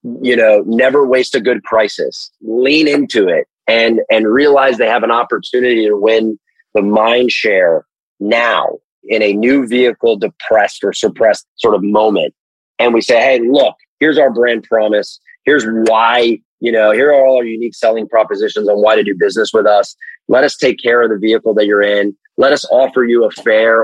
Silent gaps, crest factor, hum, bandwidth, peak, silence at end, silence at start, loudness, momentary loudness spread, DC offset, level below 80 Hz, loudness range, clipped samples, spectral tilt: 3.50-3.54 s, 8.00-8.16 s, 8.84-9.02 s, 11.48-11.56 s, 12.39-12.75 s, 13.88-13.98 s, 16.45-16.58 s; 12 dB; none; 10.5 kHz; 0 dBFS; 0 s; 0.05 s; -12 LUFS; 7 LU; under 0.1%; -60 dBFS; 2 LU; under 0.1%; -4.5 dB/octave